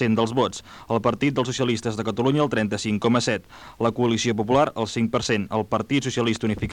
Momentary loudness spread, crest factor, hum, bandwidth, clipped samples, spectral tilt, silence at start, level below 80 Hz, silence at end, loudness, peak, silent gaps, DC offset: 5 LU; 16 dB; none; 11.5 kHz; under 0.1%; -5.5 dB/octave; 0 s; -50 dBFS; 0 s; -23 LUFS; -8 dBFS; none; under 0.1%